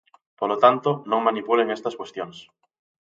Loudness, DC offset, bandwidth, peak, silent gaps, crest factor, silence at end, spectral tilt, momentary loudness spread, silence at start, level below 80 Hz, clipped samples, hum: -22 LUFS; under 0.1%; 7.8 kHz; -2 dBFS; none; 22 dB; 0.65 s; -6 dB/octave; 15 LU; 0.4 s; -74 dBFS; under 0.1%; none